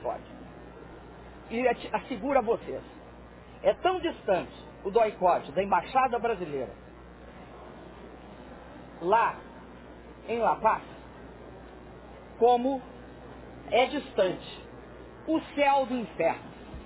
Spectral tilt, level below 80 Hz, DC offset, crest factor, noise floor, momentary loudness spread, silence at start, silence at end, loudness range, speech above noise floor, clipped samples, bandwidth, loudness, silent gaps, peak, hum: -9 dB/octave; -54 dBFS; under 0.1%; 20 dB; -48 dBFS; 23 LU; 0 s; 0 s; 5 LU; 21 dB; under 0.1%; 4 kHz; -28 LUFS; none; -10 dBFS; none